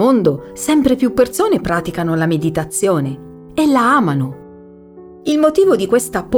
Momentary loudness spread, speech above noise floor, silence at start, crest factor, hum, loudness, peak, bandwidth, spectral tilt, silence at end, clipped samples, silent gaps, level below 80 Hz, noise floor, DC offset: 11 LU; 24 dB; 0 s; 14 dB; none; -15 LUFS; -2 dBFS; over 20 kHz; -5.5 dB/octave; 0 s; under 0.1%; none; -44 dBFS; -39 dBFS; under 0.1%